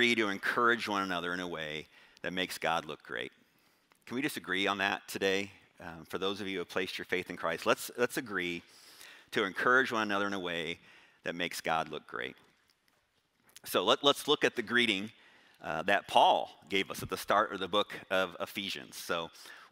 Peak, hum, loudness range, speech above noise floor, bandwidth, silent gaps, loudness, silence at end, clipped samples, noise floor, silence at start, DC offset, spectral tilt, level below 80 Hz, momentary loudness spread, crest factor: -10 dBFS; none; 6 LU; 41 dB; 16 kHz; none; -32 LUFS; 0.05 s; under 0.1%; -74 dBFS; 0 s; under 0.1%; -3 dB/octave; -72 dBFS; 15 LU; 24 dB